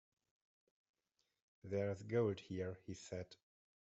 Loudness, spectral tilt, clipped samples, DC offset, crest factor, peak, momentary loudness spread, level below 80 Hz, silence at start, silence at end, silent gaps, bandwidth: -44 LUFS; -7 dB/octave; under 0.1%; under 0.1%; 20 dB; -26 dBFS; 14 LU; -80 dBFS; 1.65 s; 0.5 s; none; 8.2 kHz